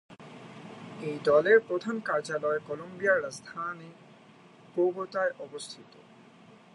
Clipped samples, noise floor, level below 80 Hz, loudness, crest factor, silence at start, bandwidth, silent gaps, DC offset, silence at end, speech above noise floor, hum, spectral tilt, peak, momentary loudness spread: under 0.1%; -55 dBFS; -76 dBFS; -29 LUFS; 20 dB; 0.1 s; 11.5 kHz; none; under 0.1%; 0.9 s; 26 dB; none; -5 dB/octave; -10 dBFS; 23 LU